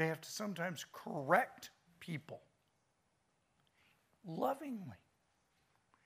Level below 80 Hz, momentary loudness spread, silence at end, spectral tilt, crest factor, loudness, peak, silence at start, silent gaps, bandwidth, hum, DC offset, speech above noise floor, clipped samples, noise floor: -86 dBFS; 22 LU; 1.1 s; -5 dB/octave; 28 dB; -40 LUFS; -16 dBFS; 0 s; none; 15.5 kHz; none; under 0.1%; 40 dB; under 0.1%; -80 dBFS